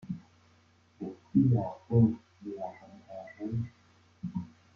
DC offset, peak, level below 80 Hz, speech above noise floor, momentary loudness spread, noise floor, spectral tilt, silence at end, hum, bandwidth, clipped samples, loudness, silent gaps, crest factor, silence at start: under 0.1%; -12 dBFS; -62 dBFS; 35 dB; 19 LU; -64 dBFS; -11 dB/octave; 0.3 s; none; 5.6 kHz; under 0.1%; -31 LUFS; none; 20 dB; 0.05 s